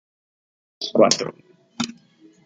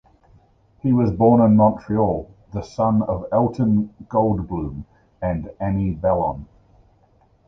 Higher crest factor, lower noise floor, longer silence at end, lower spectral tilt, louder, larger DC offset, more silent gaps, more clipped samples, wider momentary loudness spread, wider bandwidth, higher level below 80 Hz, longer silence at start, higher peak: about the same, 22 dB vs 18 dB; second, -53 dBFS vs -57 dBFS; second, 0.55 s vs 1.05 s; second, -3 dB/octave vs -10.5 dB/octave; about the same, -21 LUFS vs -20 LUFS; neither; neither; neither; about the same, 15 LU vs 14 LU; first, 10 kHz vs 6.4 kHz; second, -68 dBFS vs -40 dBFS; about the same, 0.8 s vs 0.85 s; about the same, -2 dBFS vs -4 dBFS